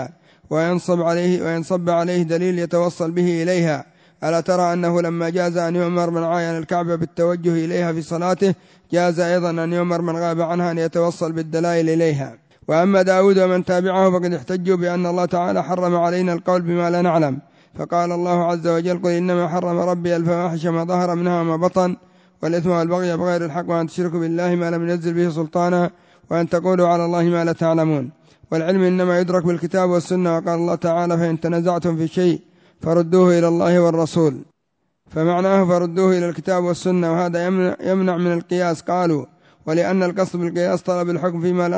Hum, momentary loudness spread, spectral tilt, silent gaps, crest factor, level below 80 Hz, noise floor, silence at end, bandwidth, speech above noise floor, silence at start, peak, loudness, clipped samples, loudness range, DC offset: none; 6 LU; -7 dB/octave; none; 14 dB; -60 dBFS; -72 dBFS; 0 s; 8 kHz; 54 dB; 0 s; -4 dBFS; -19 LUFS; under 0.1%; 3 LU; under 0.1%